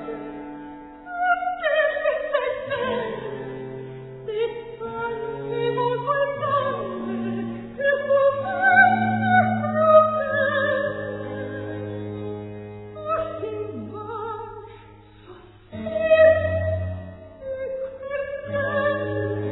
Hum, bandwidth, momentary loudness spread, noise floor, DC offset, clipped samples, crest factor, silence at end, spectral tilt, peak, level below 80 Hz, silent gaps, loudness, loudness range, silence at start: none; 4.1 kHz; 19 LU; -47 dBFS; under 0.1%; under 0.1%; 20 dB; 0 s; -10 dB/octave; -4 dBFS; -54 dBFS; none; -23 LUFS; 12 LU; 0 s